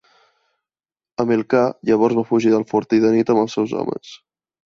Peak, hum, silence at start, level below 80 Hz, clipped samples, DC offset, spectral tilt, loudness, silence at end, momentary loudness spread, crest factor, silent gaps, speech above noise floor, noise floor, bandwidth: -4 dBFS; none; 1.2 s; -62 dBFS; under 0.1%; under 0.1%; -7 dB/octave; -18 LUFS; 0.5 s; 9 LU; 16 dB; none; over 73 dB; under -90 dBFS; 7.2 kHz